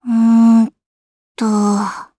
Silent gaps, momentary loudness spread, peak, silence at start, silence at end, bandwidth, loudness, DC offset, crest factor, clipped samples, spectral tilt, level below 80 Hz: 0.86-1.35 s; 10 LU; -2 dBFS; 0.05 s; 0.15 s; 11 kHz; -14 LUFS; under 0.1%; 12 dB; under 0.1%; -6.5 dB/octave; -66 dBFS